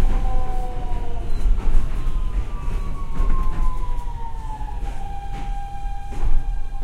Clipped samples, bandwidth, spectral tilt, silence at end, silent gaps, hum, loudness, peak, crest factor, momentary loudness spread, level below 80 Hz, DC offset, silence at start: under 0.1%; 4.3 kHz; -7 dB/octave; 0 s; none; none; -29 LUFS; -2 dBFS; 16 dB; 7 LU; -20 dBFS; under 0.1%; 0 s